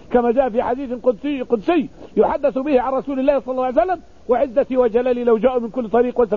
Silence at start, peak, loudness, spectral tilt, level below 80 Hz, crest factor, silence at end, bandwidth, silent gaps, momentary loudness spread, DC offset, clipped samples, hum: 0.1 s; -4 dBFS; -19 LUFS; -8 dB/octave; -46 dBFS; 14 dB; 0 s; 4.8 kHz; none; 5 LU; 0.5%; under 0.1%; none